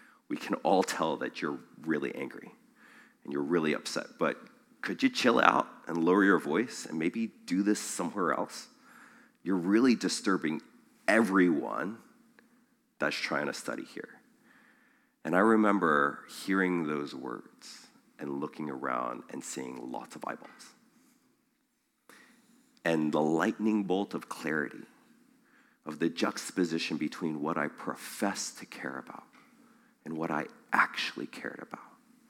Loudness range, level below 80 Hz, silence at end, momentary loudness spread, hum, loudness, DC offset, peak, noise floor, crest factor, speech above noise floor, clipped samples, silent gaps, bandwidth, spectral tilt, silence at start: 10 LU; -80 dBFS; 0.4 s; 18 LU; none; -31 LUFS; under 0.1%; -4 dBFS; -76 dBFS; 28 dB; 45 dB; under 0.1%; none; 16.5 kHz; -4.5 dB/octave; 0.3 s